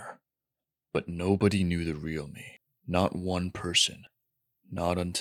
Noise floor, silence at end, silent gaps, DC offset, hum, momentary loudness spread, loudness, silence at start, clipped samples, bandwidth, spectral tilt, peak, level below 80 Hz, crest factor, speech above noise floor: -90 dBFS; 0 s; none; under 0.1%; none; 19 LU; -29 LUFS; 0 s; under 0.1%; 15.5 kHz; -4.5 dB/octave; -10 dBFS; -58 dBFS; 20 dB; 61 dB